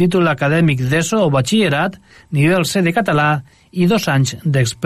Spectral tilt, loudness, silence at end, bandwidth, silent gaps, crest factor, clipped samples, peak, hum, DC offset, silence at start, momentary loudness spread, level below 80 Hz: -5.5 dB/octave; -16 LUFS; 0 s; 14.5 kHz; none; 12 dB; under 0.1%; -4 dBFS; none; under 0.1%; 0 s; 5 LU; -48 dBFS